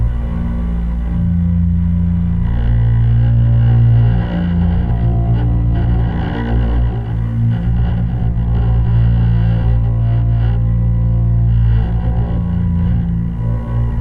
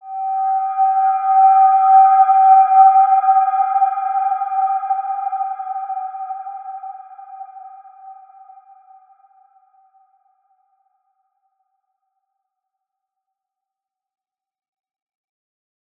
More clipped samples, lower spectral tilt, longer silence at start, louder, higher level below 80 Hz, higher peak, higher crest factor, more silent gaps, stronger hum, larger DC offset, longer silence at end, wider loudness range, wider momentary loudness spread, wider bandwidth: neither; first, -11 dB/octave vs -2 dB/octave; about the same, 0 s vs 0.05 s; about the same, -15 LUFS vs -14 LUFS; first, -18 dBFS vs under -90 dBFS; about the same, -4 dBFS vs -2 dBFS; second, 10 dB vs 16 dB; neither; neither; neither; second, 0 s vs 7.85 s; second, 3 LU vs 21 LU; second, 6 LU vs 21 LU; first, 3.6 kHz vs 2.6 kHz